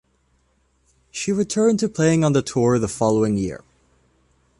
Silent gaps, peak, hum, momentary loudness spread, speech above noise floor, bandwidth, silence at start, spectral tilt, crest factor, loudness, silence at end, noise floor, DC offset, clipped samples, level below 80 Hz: none; -6 dBFS; none; 10 LU; 45 dB; 11.5 kHz; 1.15 s; -6 dB/octave; 16 dB; -20 LUFS; 1.05 s; -64 dBFS; under 0.1%; under 0.1%; -50 dBFS